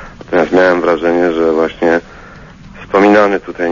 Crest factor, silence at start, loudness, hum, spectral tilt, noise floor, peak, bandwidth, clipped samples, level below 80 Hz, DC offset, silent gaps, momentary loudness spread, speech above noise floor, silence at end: 12 dB; 0 s; -12 LUFS; none; -6.5 dB/octave; -35 dBFS; 0 dBFS; 7.4 kHz; under 0.1%; -42 dBFS; under 0.1%; none; 8 LU; 24 dB; 0 s